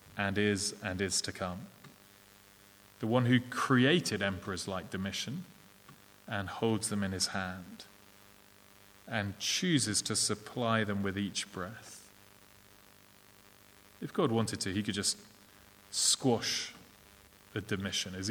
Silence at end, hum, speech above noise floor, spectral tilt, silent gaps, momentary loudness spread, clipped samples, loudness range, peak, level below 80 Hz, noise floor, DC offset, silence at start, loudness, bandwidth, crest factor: 0 s; 50 Hz at -60 dBFS; 27 dB; -3.5 dB/octave; none; 15 LU; under 0.1%; 6 LU; -12 dBFS; -70 dBFS; -60 dBFS; under 0.1%; 0.05 s; -32 LUFS; over 20 kHz; 22 dB